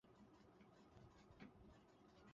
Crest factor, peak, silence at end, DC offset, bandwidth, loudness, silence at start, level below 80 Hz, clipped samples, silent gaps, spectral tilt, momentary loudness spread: 20 dB; -46 dBFS; 0 s; under 0.1%; 7.4 kHz; -68 LUFS; 0.05 s; -78 dBFS; under 0.1%; none; -5.5 dB/octave; 5 LU